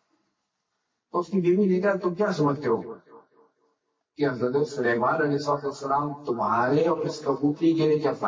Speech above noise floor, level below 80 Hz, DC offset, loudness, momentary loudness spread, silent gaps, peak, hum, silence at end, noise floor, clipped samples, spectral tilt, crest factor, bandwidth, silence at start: 55 dB; -68 dBFS; under 0.1%; -25 LUFS; 7 LU; none; -12 dBFS; none; 0 s; -79 dBFS; under 0.1%; -7 dB/octave; 14 dB; 7.6 kHz; 1.15 s